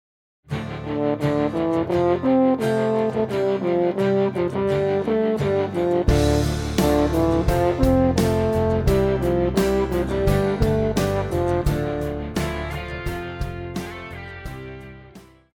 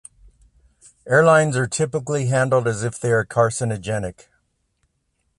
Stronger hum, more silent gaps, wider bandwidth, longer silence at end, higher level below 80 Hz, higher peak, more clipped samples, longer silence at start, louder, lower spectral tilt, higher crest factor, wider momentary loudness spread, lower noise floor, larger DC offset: neither; neither; first, 17.5 kHz vs 11.5 kHz; second, 0.35 s vs 1.25 s; first, -32 dBFS vs -52 dBFS; second, -6 dBFS vs -2 dBFS; neither; second, 0.5 s vs 1.05 s; about the same, -21 LUFS vs -19 LUFS; first, -7 dB/octave vs -5.5 dB/octave; about the same, 16 dB vs 18 dB; about the same, 12 LU vs 11 LU; second, -46 dBFS vs -70 dBFS; neither